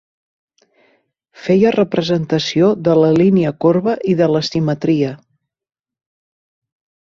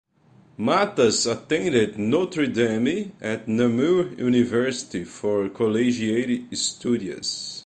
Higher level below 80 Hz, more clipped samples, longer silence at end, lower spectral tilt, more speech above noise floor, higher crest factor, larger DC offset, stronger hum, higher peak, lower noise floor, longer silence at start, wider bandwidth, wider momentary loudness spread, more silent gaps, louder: about the same, -54 dBFS vs -58 dBFS; neither; first, 1.9 s vs 0.05 s; first, -7 dB/octave vs -4.5 dB/octave; first, 46 dB vs 33 dB; about the same, 16 dB vs 16 dB; neither; neither; first, -2 dBFS vs -6 dBFS; first, -60 dBFS vs -55 dBFS; first, 1.4 s vs 0.6 s; second, 7.6 kHz vs 9.4 kHz; second, 5 LU vs 8 LU; neither; first, -15 LUFS vs -23 LUFS